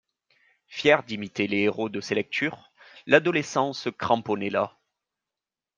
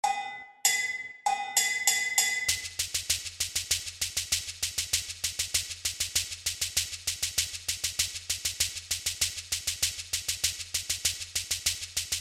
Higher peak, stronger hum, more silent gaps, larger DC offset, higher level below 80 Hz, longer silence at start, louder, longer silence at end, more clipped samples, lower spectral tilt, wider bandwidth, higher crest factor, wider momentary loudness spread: about the same, -4 dBFS vs -6 dBFS; neither; neither; neither; second, -70 dBFS vs -54 dBFS; first, 0.7 s vs 0.05 s; first, -25 LUFS vs -28 LUFS; first, 1.1 s vs 0 s; neither; first, -5 dB/octave vs 1.5 dB/octave; second, 9.6 kHz vs 16.5 kHz; about the same, 24 dB vs 24 dB; first, 11 LU vs 6 LU